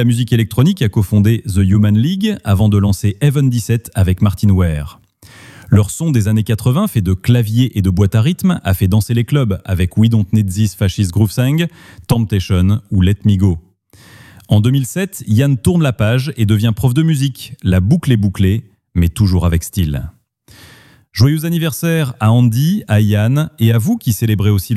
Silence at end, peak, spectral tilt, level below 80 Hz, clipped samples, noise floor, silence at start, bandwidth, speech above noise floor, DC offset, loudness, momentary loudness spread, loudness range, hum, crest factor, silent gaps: 0 s; 0 dBFS; -7 dB/octave; -34 dBFS; under 0.1%; -44 dBFS; 0 s; 15 kHz; 31 dB; under 0.1%; -14 LUFS; 5 LU; 2 LU; none; 12 dB; none